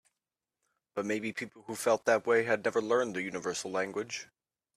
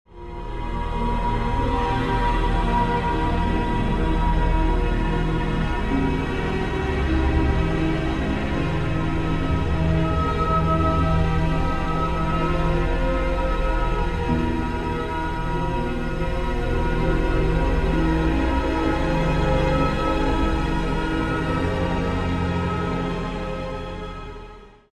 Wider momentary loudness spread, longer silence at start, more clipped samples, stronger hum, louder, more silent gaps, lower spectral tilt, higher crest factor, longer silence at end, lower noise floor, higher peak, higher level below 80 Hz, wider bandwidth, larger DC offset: first, 13 LU vs 5 LU; first, 0.95 s vs 0.1 s; neither; neither; second, -32 LUFS vs -23 LUFS; neither; second, -3.5 dB/octave vs -7.5 dB/octave; first, 22 dB vs 14 dB; first, 0.5 s vs 0.25 s; first, under -90 dBFS vs -42 dBFS; second, -12 dBFS vs -8 dBFS; second, -76 dBFS vs -26 dBFS; first, 14.5 kHz vs 11 kHz; neither